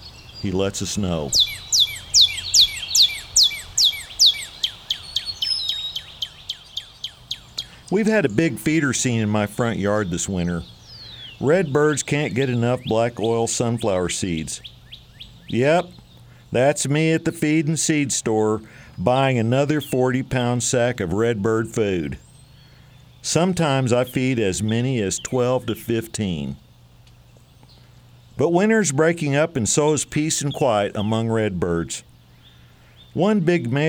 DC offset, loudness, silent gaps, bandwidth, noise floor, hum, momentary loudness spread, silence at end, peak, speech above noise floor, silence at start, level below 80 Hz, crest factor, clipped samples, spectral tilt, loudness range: under 0.1%; -20 LUFS; none; over 20 kHz; -49 dBFS; none; 15 LU; 0 s; -2 dBFS; 29 dB; 0 s; -48 dBFS; 20 dB; under 0.1%; -3.5 dB/octave; 8 LU